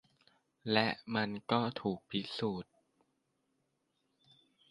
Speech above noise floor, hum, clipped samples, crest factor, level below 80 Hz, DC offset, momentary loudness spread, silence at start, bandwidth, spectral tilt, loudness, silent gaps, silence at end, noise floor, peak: 45 dB; none; under 0.1%; 24 dB; -74 dBFS; under 0.1%; 12 LU; 0.65 s; 11.5 kHz; -6.5 dB/octave; -35 LUFS; none; 2.1 s; -81 dBFS; -14 dBFS